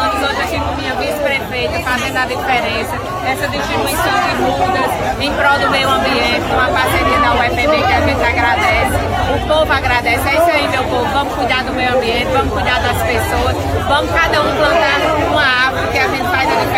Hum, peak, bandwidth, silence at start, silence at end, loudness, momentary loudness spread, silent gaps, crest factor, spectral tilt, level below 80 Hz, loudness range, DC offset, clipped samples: none; -2 dBFS; 16.5 kHz; 0 s; 0 s; -14 LUFS; 5 LU; none; 12 dB; -4.5 dB/octave; -28 dBFS; 3 LU; under 0.1%; under 0.1%